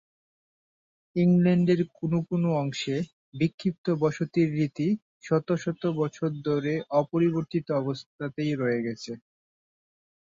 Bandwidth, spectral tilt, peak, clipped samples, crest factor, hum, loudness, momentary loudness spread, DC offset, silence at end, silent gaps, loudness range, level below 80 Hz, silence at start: 7.6 kHz; -7.5 dB/octave; -10 dBFS; under 0.1%; 16 dB; none; -27 LUFS; 10 LU; under 0.1%; 1.1 s; 3.13-3.32 s, 3.54-3.58 s, 3.78-3.84 s, 5.02-5.21 s, 8.06-8.19 s; 2 LU; -66 dBFS; 1.15 s